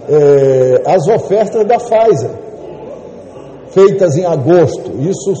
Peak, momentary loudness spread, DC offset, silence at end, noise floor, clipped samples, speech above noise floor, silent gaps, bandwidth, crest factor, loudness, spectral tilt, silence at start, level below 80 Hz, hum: 0 dBFS; 20 LU; under 0.1%; 0 s; -31 dBFS; under 0.1%; 21 dB; none; 8.8 kHz; 10 dB; -11 LUFS; -7 dB/octave; 0 s; -50 dBFS; none